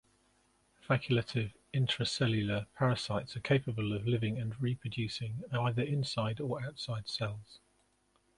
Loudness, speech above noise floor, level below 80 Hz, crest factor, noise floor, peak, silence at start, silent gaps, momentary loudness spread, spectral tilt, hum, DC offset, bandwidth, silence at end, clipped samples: -34 LUFS; 39 dB; -62 dBFS; 20 dB; -73 dBFS; -14 dBFS; 0.85 s; none; 6 LU; -6 dB/octave; none; under 0.1%; 11.5 kHz; 0.8 s; under 0.1%